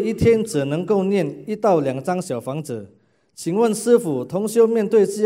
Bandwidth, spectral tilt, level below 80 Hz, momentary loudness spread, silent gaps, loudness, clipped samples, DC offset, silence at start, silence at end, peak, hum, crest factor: 16 kHz; -6.5 dB/octave; -48 dBFS; 10 LU; none; -20 LUFS; under 0.1%; under 0.1%; 0 s; 0 s; -4 dBFS; none; 16 dB